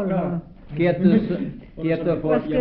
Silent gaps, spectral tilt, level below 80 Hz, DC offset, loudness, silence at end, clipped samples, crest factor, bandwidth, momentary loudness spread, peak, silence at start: none; -12 dB/octave; -44 dBFS; under 0.1%; -22 LUFS; 0 s; under 0.1%; 16 dB; 4.9 kHz; 13 LU; -6 dBFS; 0 s